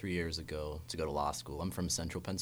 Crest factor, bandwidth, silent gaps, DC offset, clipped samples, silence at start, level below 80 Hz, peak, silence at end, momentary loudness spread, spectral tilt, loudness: 16 dB; over 20 kHz; none; under 0.1%; under 0.1%; 0 s; -50 dBFS; -22 dBFS; 0 s; 6 LU; -4 dB/octave; -38 LUFS